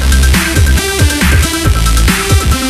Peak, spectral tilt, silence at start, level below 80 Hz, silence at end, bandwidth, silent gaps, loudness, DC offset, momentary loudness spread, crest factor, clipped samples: 0 dBFS; -4 dB/octave; 0 s; -12 dBFS; 0 s; 15.5 kHz; none; -10 LUFS; under 0.1%; 2 LU; 8 dB; under 0.1%